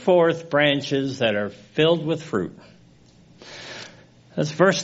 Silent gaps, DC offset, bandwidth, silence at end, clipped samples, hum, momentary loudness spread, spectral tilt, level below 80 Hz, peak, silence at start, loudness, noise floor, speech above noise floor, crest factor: none; under 0.1%; 8 kHz; 0 s; under 0.1%; none; 18 LU; -4 dB/octave; -62 dBFS; -2 dBFS; 0 s; -22 LUFS; -52 dBFS; 31 dB; 20 dB